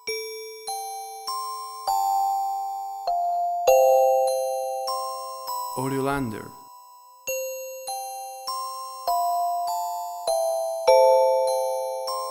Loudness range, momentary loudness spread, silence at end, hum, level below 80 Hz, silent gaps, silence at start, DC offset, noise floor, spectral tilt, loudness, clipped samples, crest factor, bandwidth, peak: 8 LU; 15 LU; 0 s; none; -60 dBFS; none; 0.05 s; under 0.1%; -49 dBFS; -3.5 dB/octave; -25 LUFS; under 0.1%; 20 dB; 19 kHz; -4 dBFS